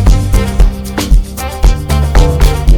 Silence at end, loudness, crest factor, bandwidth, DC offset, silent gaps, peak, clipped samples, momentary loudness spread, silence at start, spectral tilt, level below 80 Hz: 0 s; -12 LUFS; 8 dB; 17.5 kHz; under 0.1%; none; 0 dBFS; 0.7%; 4 LU; 0 s; -6 dB/octave; -10 dBFS